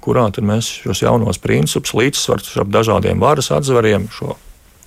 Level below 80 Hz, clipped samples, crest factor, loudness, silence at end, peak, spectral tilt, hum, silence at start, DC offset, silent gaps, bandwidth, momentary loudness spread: -40 dBFS; under 0.1%; 14 dB; -15 LUFS; 0.5 s; -2 dBFS; -5 dB/octave; none; 0.05 s; under 0.1%; none; 16 kHz; 6 LU